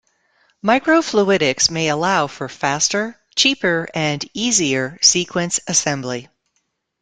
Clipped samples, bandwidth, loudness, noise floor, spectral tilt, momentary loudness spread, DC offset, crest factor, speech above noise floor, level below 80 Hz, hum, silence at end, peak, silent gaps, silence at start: under 0.1%; 11 kHz; -17 LUFS; -70 dBFS; -2.5 dB/octave; 9 LU; under 0.1%; 18 dB; 52 dB; -56 dBFS; none; 0.75 s; 0 dBFS; none; 0.65 s